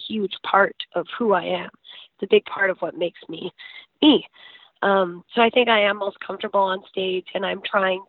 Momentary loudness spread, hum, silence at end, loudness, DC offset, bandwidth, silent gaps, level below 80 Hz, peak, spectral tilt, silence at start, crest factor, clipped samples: 17 LU; none; 0.05 s; -21 LUFS; under 0.1%; 4.6 kHz; none; -72 dBFS; -2 dBFS; -9 dB/octave; 0 s; 20 dB; under 0.1%